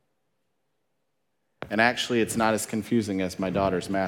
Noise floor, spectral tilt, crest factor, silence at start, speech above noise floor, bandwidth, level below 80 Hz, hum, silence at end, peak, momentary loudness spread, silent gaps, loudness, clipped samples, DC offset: -79 dBFS; -4.5 dB/octave; 22 dB; 1.6 s; 53 dB; 17.5 kHz; -58 dBFS; none; 0 s; -6 dBFS; 6 LU; none; -25 LUFS; under 0.1%; under 0.1%